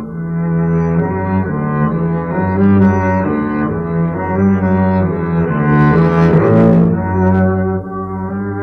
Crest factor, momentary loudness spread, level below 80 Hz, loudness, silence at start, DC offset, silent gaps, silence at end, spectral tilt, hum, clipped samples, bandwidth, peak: 12 dB; 8 LU; -36 dBFS; -14 LUFS; 0 s; under 0.1%; none; 0 s; -10.5 dB/octave; none; under 0.1%; 5.8 kHz; 0 dBFS